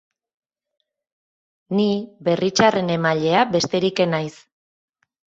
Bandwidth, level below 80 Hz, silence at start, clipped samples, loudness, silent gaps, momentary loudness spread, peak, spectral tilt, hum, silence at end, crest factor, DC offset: 8 kHz; -62 dBFS; 1.7 s; under 0.1%; -20 LUFS; none; 7 LU; 0 dBFS; -5 dB/octave; none; 1.05 s; 22 dB; under 0.1%